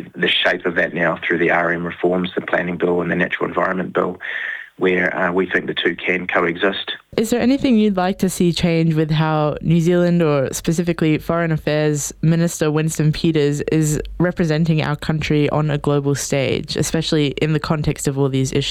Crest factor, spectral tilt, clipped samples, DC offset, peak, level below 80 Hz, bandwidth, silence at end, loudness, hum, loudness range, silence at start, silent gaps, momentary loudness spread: 16 dB; -5.5 dB/octave; under 0.1%; under 0.1%; -2 dBFS; -42 dBFS; 15.5 kHz; 0 s; -18 LUFS; none; 2 LU; 0 s; none; 5 LU